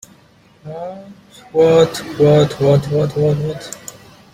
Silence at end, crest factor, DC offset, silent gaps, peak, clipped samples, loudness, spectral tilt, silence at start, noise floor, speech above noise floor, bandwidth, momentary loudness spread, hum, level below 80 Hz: 0.4 s; 16 dB; under 0.1%; none; -2 dBFS; under 0.1%; -14 LUFS; -6.5 dB/octave; 0.65 s; -49 dBFS; 34 dB; 15.5 kHz; 20 LU; none; -48 dBFS